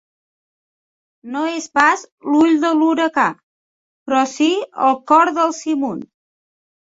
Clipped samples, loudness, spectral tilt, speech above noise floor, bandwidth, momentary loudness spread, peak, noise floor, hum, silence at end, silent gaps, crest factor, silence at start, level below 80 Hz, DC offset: under 0.1%; -17 LUFS; -3.5 dB/octave; over 74 dB; 7.8 kHz; 10 LU; 0 dBFS; under -90 dBFS; none; 0.9 s; 2.12-2.18 s, 3.43-4.06 s; 18 dB; 1.25 s; -66 dBFS; under 0.1%